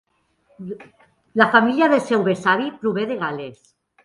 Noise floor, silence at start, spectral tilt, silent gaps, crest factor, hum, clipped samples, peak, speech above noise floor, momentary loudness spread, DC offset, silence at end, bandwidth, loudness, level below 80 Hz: -63 dBFS; 0.6 s; -6 dB/octave; none; 20 dB; none; under 0.1%; 0 dBFS; 43 dB; 20 LU; under 0.1%; 0.5 s; 11.5 kHz; -19 LUFS; -66 dBFS